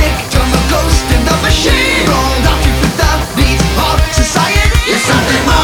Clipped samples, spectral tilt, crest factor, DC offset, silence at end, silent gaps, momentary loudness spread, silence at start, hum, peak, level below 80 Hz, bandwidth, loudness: under 0.1%; -4 dB/octave; 10 dB; under 0.1%; 0 s; none; 3 LU; 0 s; none; 0 dBFS; -14 dBFS; 19 kHz; -11 LUFS